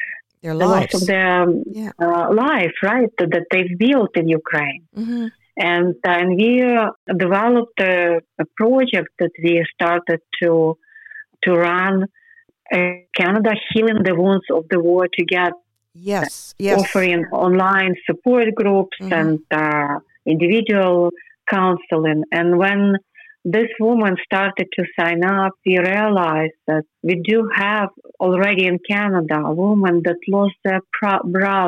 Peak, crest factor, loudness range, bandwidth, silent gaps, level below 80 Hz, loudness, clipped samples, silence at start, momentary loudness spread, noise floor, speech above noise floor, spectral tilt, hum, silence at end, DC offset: -2 dBFS; 14 dB; 2 LU; 13 kHz; 6.96-7.07 s; -64 dBFS; -17 LUFS; under 0.1%; 0 s; 7 LU; -49 dBFS; 32 dB; -6.5 dB/octave; none; 0 s; under 0.1%